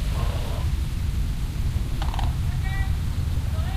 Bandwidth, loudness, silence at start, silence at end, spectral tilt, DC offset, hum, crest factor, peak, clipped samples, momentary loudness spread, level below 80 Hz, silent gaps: 15.5 kHz; -27 LUFS; 0 s; 0 s; -6 dB/octave; under 0.1%; none; 12 dB; -12 dBFS; under 0.1%; 2 LU; -26 dBFS; none